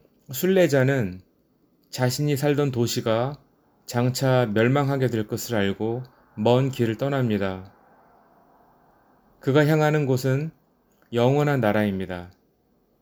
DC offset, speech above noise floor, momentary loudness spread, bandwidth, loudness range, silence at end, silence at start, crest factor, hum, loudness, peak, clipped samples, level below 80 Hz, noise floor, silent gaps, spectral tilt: under 0.1%; 43 dB; 13 LU; over 20 kHz; 3 LU; 0.75 s; 0.3 s; 20 dB; none; -23 LUFS; -4 dBFS; under 0.1%; -60 dBFS; -65 dBFS; none; -6.5 dB/octave